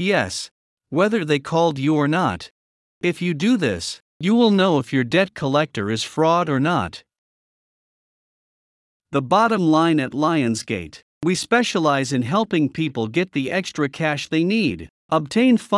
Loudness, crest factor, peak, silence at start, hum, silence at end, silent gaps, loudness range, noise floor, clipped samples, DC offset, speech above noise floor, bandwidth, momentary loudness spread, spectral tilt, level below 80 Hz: -20 LUFS; 16 dB; -4 dBFS; 0 s; none; 0 s; 0.51-0.77 s, 2.51-3.01 s, 4.02-4.20 s, 7.18-9.00 s, 11.03-11.21 s, 14.90-15.09 s; 4 LU; under -90 dBFS; under 0.1%; under 0.1%; over 71 dB; 12 kHz; 9 LU; -5.5 dB/octave; -60 dBFS